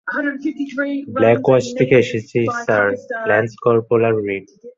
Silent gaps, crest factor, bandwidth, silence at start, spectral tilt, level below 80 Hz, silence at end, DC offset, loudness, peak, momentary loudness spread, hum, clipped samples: none; 16 dB; 7.8 kHz; 0.05 s; -6.5 dB/octave; -56 dBFS; 0.05 s; under 0.1%; -17 LUFS; -2 dBFS; 9 LU; none; under 0.1%